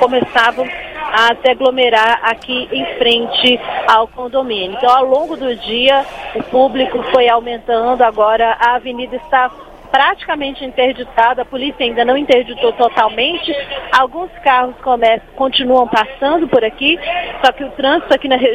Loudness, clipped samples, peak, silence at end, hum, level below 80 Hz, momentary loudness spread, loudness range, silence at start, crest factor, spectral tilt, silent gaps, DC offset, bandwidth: -13 LUFS; 0.2%; 0 dBFS; 0 s; none; -44 dBFS; 8 LU; 2 LU; 0 s; 14 dB; -4 dB/octave; none; under 0.1%; 10.5 kHz